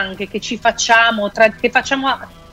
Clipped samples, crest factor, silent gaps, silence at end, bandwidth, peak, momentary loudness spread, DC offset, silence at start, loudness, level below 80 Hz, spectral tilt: under 0.1%; 16 dB; none; 0.25 s; 15 kHz; 0 dBFS; 11 LU; under 0.1%; 0 s; -15 LUFS; -46 dBFS; -2 dB/octave